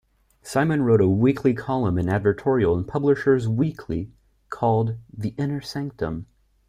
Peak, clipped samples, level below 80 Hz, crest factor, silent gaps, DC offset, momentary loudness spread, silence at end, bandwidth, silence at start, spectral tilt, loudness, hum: -6 dBFS; under 0.1%; -50 dBFS; 16 dB; none; under 0.1%; 12 LU; 0.45 s; 15 kHz; 0.45 s; -8 dB/octave; -23 LUFS; none